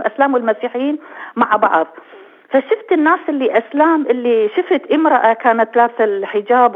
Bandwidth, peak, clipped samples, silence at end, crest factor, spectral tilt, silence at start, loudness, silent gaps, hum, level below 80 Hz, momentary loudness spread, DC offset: 4 kHz; 0 dBFS; under 0.1%; 0 s; 14 dB; -7 dB/octave; 0 s; -15 LUFS; none; none; -70 dBFS; 7 LU; under 0.1%